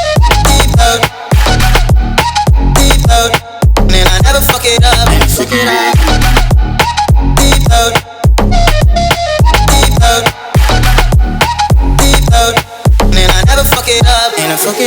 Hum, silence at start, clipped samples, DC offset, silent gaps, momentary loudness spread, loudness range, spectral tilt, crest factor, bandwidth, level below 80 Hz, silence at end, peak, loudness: none; 0 s; 0.3%; under 0.1%; none; 4 LU; 1 LU; -4 dB/octave; 8 dB; over 20 kHz; -10 dBFS; 0 s; 0 dBFS; -9 LUFS